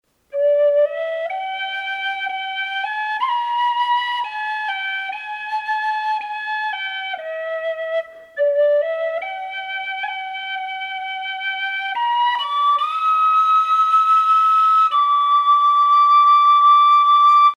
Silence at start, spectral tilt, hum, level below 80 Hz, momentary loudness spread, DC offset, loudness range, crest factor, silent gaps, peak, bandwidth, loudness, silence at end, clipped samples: 0.35 s; 0.5 dB/octave; none; -74 dBFS; 14 LU; under 0.1%; 10 LU; 12 dB; none; -6 dBFS; 10.5 kHz; -17 LUFS; 0.05 s; under 0.1%